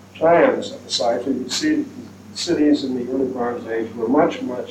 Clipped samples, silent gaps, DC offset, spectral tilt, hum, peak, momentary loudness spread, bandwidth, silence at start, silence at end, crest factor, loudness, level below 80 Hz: under 0.1%; none; under 0.1%; -4 dB/octave; none; -4 dBFS; 11 LU; 13 kHz; 0 s; 0 s; 16 dB; -20 LUFS; -62 dBFS